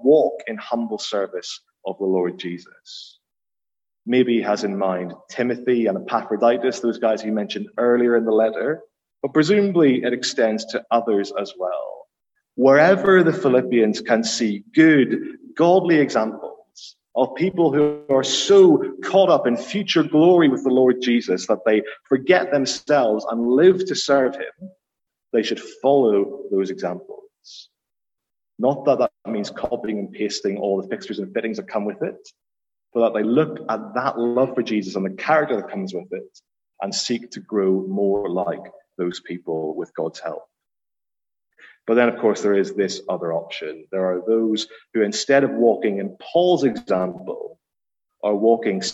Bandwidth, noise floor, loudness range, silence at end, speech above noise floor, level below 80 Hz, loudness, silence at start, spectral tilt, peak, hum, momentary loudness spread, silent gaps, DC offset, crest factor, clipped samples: 8.2 kHz; under -90 dBFS; 8 LU; 0 s; over 70 dB; -68 dBFS; -20 LUFS; 0 s; -5 dB/octave; -2 dBFS; none; 14 LU; none; under 0.1%; 18 dB; under 0.1%